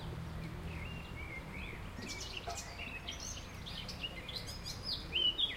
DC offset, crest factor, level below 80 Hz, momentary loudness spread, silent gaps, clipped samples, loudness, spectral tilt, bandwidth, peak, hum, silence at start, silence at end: under 0.1%; 18 dB; -50 dBFS; 11 LU; none; under 0.1%; -41 LUFS; -3 dB/octave; 16 kHz; -24 dBFS; none; 0 s; 0 s